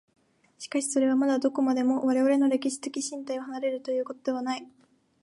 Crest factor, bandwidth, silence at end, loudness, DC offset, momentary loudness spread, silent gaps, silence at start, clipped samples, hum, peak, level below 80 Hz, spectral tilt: 14 dB; 11.5 kHz; 0.55 s; -27 LUFS; under 0.1%; 10 LU; none; 0.6 s; under 0.1%; none; -14 dBFS; -82 dBFS; -3 dB/octave